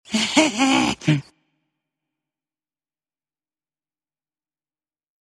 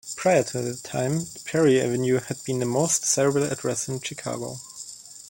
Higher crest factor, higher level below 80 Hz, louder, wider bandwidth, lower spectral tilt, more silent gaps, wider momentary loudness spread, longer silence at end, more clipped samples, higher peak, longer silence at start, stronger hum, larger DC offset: first, 24 dB vs 18 dB; about the same, -60 dBFS vs -62 dBFS; first, -19 LUFS vs -24 LUFS; second, 13.5 kHz vs 17 kHz; about the same, -4 dB/octave vs -4.5 dB/octave; neither; second, 5 LU vs 13 LU; first, 4.2 s vs 0 s; neither; first, -2 dBFS vs -6 dBFS; about the same, 0.1 s vs 0.05 s; neither; neither